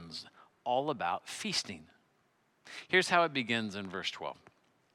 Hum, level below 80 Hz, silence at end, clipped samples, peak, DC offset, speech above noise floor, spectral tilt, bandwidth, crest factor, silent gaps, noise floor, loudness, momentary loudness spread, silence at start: none; -80 dBFS; 0.6 s; under 0.1%; -12 dBFS; under 0.1%; 39 dB; -3 dB/octave; 15 kHz; 22 dB; none; -73 dBFS; -32 LUFS; 18 LU; 0 s